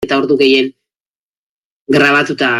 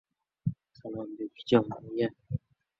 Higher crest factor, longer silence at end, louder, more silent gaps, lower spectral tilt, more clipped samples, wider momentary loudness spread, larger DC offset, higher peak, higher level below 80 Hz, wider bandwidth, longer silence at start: second, 14 dB vs 24 dB; second, 0 s vs 0.4 s; first, -12 LUFS vs -32 LUFS; first, 0.96-1.86 s vs none; second, -5 dB/octave vs -8 dB/octave; neither; second, 5 LU vs 13 LU; neither; first, 0 dBFS vs -8 dBFS; first, -54 dBFS vs -60 dBFS; first, 13 kHz vs 7.6 kHz; second, 0 s vs 0.45 s